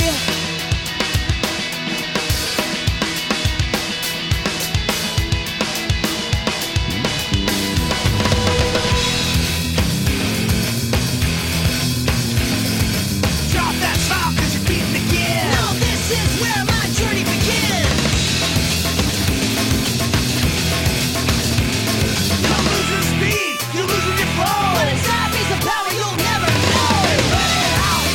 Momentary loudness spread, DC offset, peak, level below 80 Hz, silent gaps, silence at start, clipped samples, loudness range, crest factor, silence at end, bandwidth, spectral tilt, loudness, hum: 4 LU; under 0.1%; -4 dBFS; -28 dBFS; none; 0 s; under 0.1%; 3 LU; 14 dB; 0 s; 18 kHz; -3.5 dB/octave; -18 LUFS; none